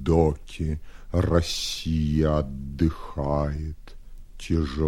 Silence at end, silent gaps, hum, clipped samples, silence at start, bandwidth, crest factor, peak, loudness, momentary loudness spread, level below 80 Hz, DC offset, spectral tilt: 0 s; none; none; under 0.1%; 0 s; 14 kHz; 20 dB; -6 dBFS; -26 LUFS; 11 LU; -34 dBFS; under 0.1%; -6.5 dB/octave